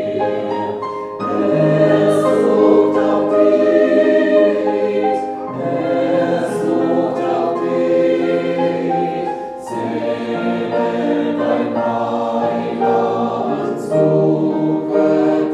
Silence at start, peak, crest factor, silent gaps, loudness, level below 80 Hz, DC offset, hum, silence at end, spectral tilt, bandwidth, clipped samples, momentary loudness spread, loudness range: 0 s; 0 dBFS; 14 dB; none; -16 LUFS; -62 dBFS; under 0.1%; none; 0 s; -7.5 dB/octave; 11.5 kHz; under 0.1%; 9 LU; 6 LU